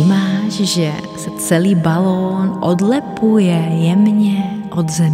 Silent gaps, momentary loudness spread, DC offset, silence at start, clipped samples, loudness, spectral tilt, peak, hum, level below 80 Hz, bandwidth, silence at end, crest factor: none; 7 LU; under 0.1%; 0 s; under 0.1%; -15 LUFS; -6 dB/octave; 0 dBFS; none; -52 dBFS; 15.5 kHz; 0 s; 14 dB